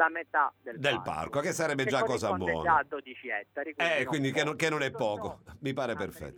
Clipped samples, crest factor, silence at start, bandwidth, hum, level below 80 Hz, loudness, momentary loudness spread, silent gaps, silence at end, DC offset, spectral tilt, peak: under 0.1%; 20 dB; 0 s; over 20 kHz; none; -60 dBFS; -30 LUFS; 10 LU; none; 0 s; under 0.1%; -4.5 dB/octave; -12 dBFS